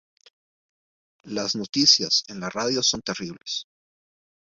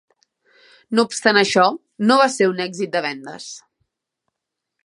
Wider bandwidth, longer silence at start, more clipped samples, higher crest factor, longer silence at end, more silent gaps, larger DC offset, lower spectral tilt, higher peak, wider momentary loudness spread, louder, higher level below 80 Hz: second, 7.8 kHz vs 11.5 kHz; first, 1.25 s vs 0.9 s; neither; about the same, 24 dB vs 20 dB; second, 0.8 s vs 1.25 s; neither; neither; second, -2 dB/octave vs -3.5 dB/octave; second, -4 dBFS vs 0 dBFS; second, 15 LU vs 18 LU; second, -22 LUFS vs -18 LUFS; first, -64 dBFS vs -70 dBFS